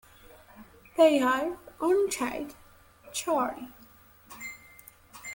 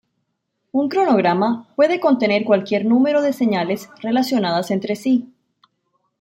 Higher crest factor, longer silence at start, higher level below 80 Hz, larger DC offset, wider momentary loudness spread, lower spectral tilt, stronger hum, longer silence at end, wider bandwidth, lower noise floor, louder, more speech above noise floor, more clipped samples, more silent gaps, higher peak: first, 22 dB vs 16 dB; second, 0.6 s vs 0.75 s; about the same, -64 dBFS vs -68 dBFS; neither; first, 23 LU vs 6 LU; second, -3 dB/octave vs -6 dB/octave; neither; second, 0 s vs 0.95 s; about the same, 17 kHz vs 16.5 kHz; second, -56 dBFS vs -74 dBFS; second, -27 LUFS vs -18 LUFS; second, 30 dB vs 56 dB; neither; neither; second, -8 dBFS vs -4 dBFS